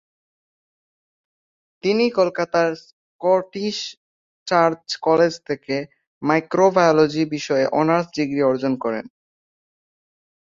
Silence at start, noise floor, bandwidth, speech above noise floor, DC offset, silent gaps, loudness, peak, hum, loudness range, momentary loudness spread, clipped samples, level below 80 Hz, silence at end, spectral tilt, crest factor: 1.85 s; under -90 dBFS; 7.6 kHz; over 71 dB; under 0.1%; 2.93-3.19 s, 3.97-4.46 s, 6.07-6.21 s; -20 LUFS; -2 dBFS; none; 4 LU; 11 LU; under 0.1%; -64 dBFS; 1.4 s; -5.5 dB/octave; 20 dB